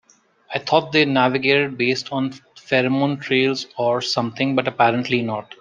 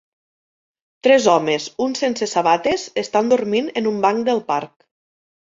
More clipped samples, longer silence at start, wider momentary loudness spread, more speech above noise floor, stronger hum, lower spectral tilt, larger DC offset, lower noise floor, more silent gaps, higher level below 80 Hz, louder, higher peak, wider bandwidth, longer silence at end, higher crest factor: neither; second, 0.5 s vs 1.05 s; about the same, 8 LU vs 8 LU; second, 28 dB vs over 72 dB; neither; first, -5.5 dB/octave vs -4 dB/octave; neither; second, -48 dBFS vs under -90 dBFS; neither; about the same, -64 dBFS vs -60 dBFS; about the same, -20 LUFS vs -18 LUFS; about the same, -2 dBFS vs -2 dBFS; first, 9.2 kHz vs 7.8 kHz; second, 0.05 s vs 0.75 s; about the same, 18 dB vs 18 dB